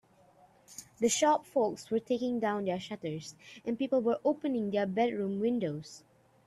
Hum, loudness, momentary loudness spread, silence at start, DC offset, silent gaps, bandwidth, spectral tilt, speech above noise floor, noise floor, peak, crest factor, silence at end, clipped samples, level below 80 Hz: none; -32 LUFS; 15 LU; 0.7 s; under 0.1%; none; 13.5 kHz; -4.5 dB/octave; 31 dB; -62 dBFS; -14 dBFS; 18 dB; 0.5 s; under 0.1%; -74 dBFS